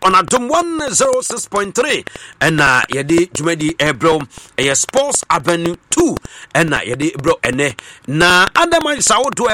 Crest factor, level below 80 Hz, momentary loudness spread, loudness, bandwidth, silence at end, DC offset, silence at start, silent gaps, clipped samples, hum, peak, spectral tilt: 14 dB; -42 dBFS; 8 LU; -14 LUFS; 16.5 kHz; 0 s; under 0.1%; 0 s; none; under 0.1%; none; 0 dBFS; -3 dB/octave